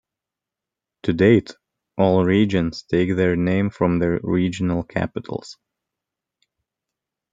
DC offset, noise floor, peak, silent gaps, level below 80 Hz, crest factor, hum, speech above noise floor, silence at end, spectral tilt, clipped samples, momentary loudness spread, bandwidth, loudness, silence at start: under 0.1%; -87 dBFS; -2 dBFS; none; -52 dBFS; 20 dB; none; 67 dB; 1.8 s; -7.5 dB/octave; under 0.1%; 13 LU; 7.8 kHz; -20 LUFS; 1.05 s